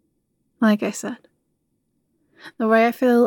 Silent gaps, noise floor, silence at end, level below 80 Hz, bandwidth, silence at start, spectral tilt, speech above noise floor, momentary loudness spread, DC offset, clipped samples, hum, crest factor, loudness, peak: none; -71 dBFS; 0 s; -80 dBFS; 17.5 kHz; 0.6 s; -5.5 dB/octave; 53 dB; 15 LU; under 0.1%; under 0.1%; none; 18 dB; -20 LUFS; -4 dBFS